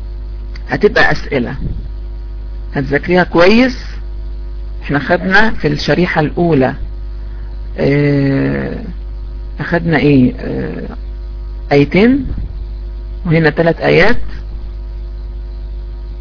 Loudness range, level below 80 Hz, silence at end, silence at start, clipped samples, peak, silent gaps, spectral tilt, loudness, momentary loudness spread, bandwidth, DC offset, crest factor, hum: 3 LU; -24 dBFS; 0 s; 0 s; under 0.1%; 0 dBFS; none; -7.5 dB/octave; -13 LUFS; 18 LU; 5.4 kHz; under 0.1%; 14 dB; 50 Hz at -25 dBFS